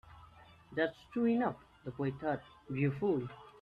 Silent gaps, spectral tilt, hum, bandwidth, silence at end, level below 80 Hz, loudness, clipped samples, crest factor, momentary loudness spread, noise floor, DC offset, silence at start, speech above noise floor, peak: none; -9 dB/octave; none; 5.2 kHz; 0.1 s; -66 dBFS; -36 LUFS; under 0.1%; 16 dB; 12 LU; -59 dBFS; under 0.1%; 0.05 s; 24 dB; -20 dBFS